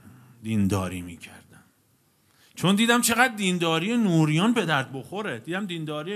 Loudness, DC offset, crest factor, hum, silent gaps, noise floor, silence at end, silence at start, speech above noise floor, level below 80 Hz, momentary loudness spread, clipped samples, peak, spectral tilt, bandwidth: -24 LUFS; under 0.1%; 22 dB; none; none; -65 dBFS; 0 s; 0.05 s; 41 dB; -64 dBFS; 15 LU; under 0.1%; -4 dBFS; -4.5 dB/octave; 14 kHz